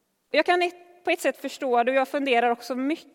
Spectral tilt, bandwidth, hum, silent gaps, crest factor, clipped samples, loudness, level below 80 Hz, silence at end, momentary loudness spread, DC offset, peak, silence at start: -2.5 dB/octave; 17.5 kHz; none; none; 18 dB; under 0.1%; -25 LUFS; -82 dBFS; 0.15 s; 6 LU; under 0.1%; -8 dBFS; 0.35 s